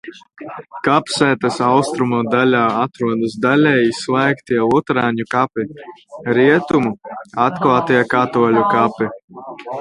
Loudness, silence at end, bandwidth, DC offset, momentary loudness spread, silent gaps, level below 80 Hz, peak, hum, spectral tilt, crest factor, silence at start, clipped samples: -16 LUFS; 0 s; 11.5 kHz; under 0.1%; 16 LU; 9.24-9.28 s; -56 dBFS; 0 dBFS; none; -6 dB/octave; 16 dB; 0.05 s; under 0.1%